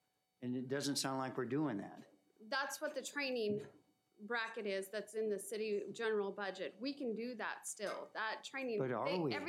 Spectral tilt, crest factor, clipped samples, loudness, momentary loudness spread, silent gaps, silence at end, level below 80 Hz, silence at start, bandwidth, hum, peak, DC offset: -4 dB/octave; 18 dB; under 0.1%; -41 LUFS; 6 LU; none; 0 s; under -90 dBFS; 0.4 s; 16 kHz; none; -24 dBFS; under 0.1%